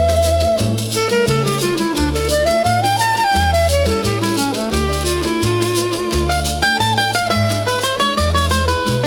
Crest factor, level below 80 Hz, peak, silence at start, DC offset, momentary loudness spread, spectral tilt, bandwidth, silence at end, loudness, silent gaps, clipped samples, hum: 14 dB; -30 dBFS; -2 dBFS; 0 s; under 0.1%; 3 LU; -4.5 dB/octave; 18 kHz; 0 s; -16 LUFS; none; under 0.1%; none